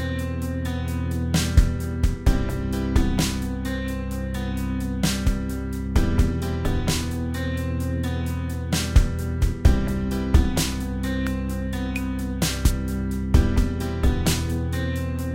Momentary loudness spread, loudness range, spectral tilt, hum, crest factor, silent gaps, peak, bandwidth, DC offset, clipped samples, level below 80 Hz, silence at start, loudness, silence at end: 7 LU; 2 LU; -5.5 dB/octave; none; 18 dB; none; -4 dBFS; 16.5 kHz; under 0.1%; under 0.1%; -26 dBFS; 0 s; -25 LUFS; 0 s